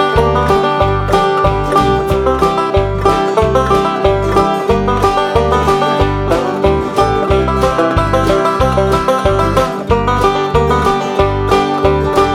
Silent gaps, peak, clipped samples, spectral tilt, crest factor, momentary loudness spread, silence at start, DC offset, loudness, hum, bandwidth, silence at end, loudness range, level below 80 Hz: none; 0 dBFS; under 0.1%; -6 dB/octave; 12 dB; 2 LU; 0 s; under 0.1%; -12 LUFS; none; 15.5 kHz; 0 s; 0 LU; -24 dBFS